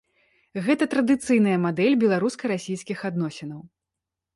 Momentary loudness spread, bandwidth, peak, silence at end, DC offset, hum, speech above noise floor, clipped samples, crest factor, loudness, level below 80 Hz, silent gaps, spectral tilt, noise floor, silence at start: 15 LU; 11.5 kHz; -8 dBFS; 0.7 s; under 0.1%; none; 63 dB; under 0.1%; 16 dB; -23 LUFS; -66 dBFS; none; -6 dB/octave; -86 dBFS; 0.55 s